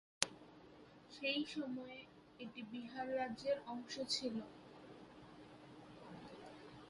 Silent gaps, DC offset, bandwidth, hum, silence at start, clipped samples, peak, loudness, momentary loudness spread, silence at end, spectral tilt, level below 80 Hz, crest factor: none; under 0.1%; 11.5 kHz; none; 0.2 s; under 0.1%; -8 dBFS; -44 LUFS; 19 LU; 0 s; -2.5 dB/octave; -78 dBFS; 40 dB